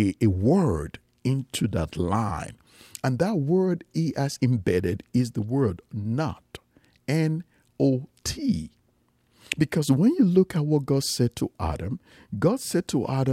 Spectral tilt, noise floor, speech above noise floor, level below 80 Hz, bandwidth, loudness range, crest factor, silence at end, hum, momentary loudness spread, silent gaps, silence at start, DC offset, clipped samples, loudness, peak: -6.5 dB/octave; -66 dBFS; 42 dB; -48 dBFS; 16 kHz; 4 LU; 20 dB; 0 s; none; 12 LU; none; 0 s; under 0.1%; under 0.1%; -25 LUFS; -4 dBFS